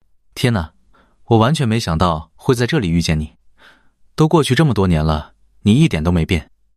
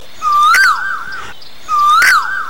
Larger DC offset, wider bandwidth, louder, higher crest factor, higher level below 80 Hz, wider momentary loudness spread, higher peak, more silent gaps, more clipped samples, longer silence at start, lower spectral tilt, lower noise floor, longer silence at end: second, 0.2% vs 5%; second, 13.5 kHz vs 16.5 kHz; second, -17 LUFS vs -10 LUFS; about the same, 16 dB vs 12 dB; first, -36 dBFS vs -50 dBFS; second, 9 LU vs 18 LU; about the same, -2 dBFS vs 0 dBFS; neither; neither; first, 0.35 s vs 0.2 s; first, -6.5 dB/octave vs 1 dB/octave; first, -53 dBFS vs -32 dBFS; first, 0.35 s vs 0 s